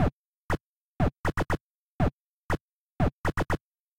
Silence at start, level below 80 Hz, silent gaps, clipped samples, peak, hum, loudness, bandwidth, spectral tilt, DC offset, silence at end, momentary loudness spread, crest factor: 0 s; -40 dBFS; 0.13-0.49 s, 0.61-0.97 s, 1.17-1.24 s, 1.61-1.99 s, 2.13-2.49 s, 2.61-2.96 s, 3.13-3.24 s, 3.61-3.92 s; under 0.1%; -14 dBFS; none; -31 LUFS; 16.5 kHz; -7 dB/octave; 0.5%; 0 s; 5 LU; 16 dB